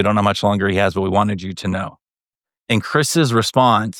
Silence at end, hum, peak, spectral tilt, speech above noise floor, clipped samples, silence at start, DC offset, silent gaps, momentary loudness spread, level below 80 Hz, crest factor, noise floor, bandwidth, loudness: 0 s; none; -2 dBFS; -5 dB/octave; over 73 dB; under 0.1%; 0 s; under 0.1%; none; 9 LU; -52 dBFS; 16 dB; under -90 dBFS; 18.5 kHz; -17 LUFS